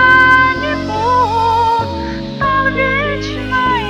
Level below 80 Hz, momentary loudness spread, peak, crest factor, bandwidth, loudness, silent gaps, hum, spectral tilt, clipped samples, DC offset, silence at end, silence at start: -32 dBFS; 11 LU; 0 dBFS; 14 dB; 12 kHz; -13 LUFS; none; none; -5.5 dB/octave; under 0.1%; under 0.1%; 0 s; 0 s